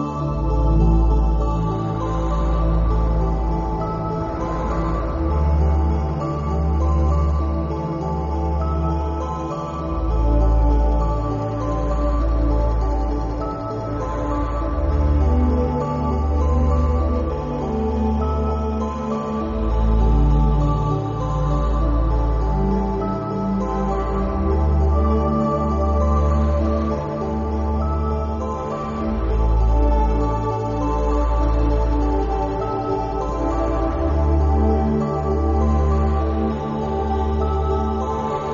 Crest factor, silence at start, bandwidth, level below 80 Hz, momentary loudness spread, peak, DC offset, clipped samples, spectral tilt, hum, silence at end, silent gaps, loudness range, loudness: 12 dB; 0 s; 7.2 kHz; -22 dBFS; 6 LU; -6 dBFS; under 0.1%; under 0.1%; -9 dB/octave; none; 0 s; none; 2 LU; -21 LUFS